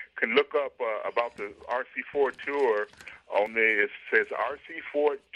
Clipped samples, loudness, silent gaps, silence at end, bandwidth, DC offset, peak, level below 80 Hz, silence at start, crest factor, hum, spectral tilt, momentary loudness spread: under 0.1%; -28 LUFS; none; 0.2 s; 9.6 kHz; under 0.1%; -6 dBFS; -72 dBFS; 0 s; 22 dB; none; -4 dB/octave; 10 LU